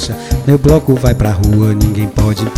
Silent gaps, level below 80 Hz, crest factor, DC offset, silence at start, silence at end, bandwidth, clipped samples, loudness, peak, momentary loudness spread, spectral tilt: none; -20 dBFS; 10 dB; under 0.1%; 0 s; 0 s; 16 kHz; 0.5%; -12 LUFS; 0 dBFS; 5 LU; -7 dB/octave